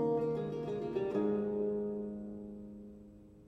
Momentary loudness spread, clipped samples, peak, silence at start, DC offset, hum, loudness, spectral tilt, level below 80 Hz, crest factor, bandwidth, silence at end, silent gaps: 18 LU; under 0.1%; -22 dBFS; 0 s; under 0.1%; none; -37 LUFS; -9.5 dB/octave; -64 dBFS; 14 dB; 7.6 kHz; 0 s; none